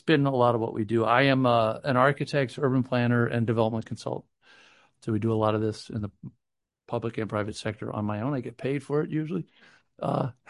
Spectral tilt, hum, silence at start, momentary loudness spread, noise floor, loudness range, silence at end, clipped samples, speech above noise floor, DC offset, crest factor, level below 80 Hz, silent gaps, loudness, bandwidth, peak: -7 dB/octave; none; 0.05 s; 13 LU; -60 dBFS; 8 LU; 0.15 s; under 0.1%; 34 dB; under 0.1%; 22 dB; -60 dBFS; none; -27 LUFS; 11.5 kHz; -6 dBFS